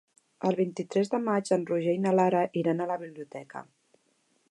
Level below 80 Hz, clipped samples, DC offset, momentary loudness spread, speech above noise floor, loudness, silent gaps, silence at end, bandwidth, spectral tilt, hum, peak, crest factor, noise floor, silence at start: -80 dBFS; under 0.1%; under 0.1%; 17 LU; 43 dB; -28 LUFS; none; 0.85 s; 11.5 kHz; -7 dB/octave; none; -12 dBFS; 18 dB; -70 dBFS; 0.4 s